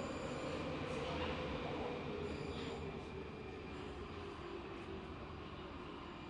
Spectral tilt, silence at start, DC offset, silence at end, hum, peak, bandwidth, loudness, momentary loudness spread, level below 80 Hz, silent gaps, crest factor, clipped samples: -6 dB/octave; 0 s; under 0.1%; 0 s; none; -30 dBFS; 11 kHz; -45 LUFS; 8 LU; -58 dBFS; none; 16 dB; under 0.1%